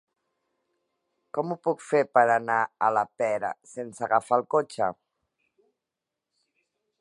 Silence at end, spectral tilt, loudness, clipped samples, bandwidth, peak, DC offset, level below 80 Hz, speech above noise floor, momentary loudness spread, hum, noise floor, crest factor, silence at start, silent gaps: 2.05 s; -5.5 dB/octave; -26 LUFS; under 0.1%; 11 kHz; -6 dBFS; under 0.1%; -76 dBFS; 62 dB; 12 LU; none; -87 dBFS; 22 dB; 1.35 s; none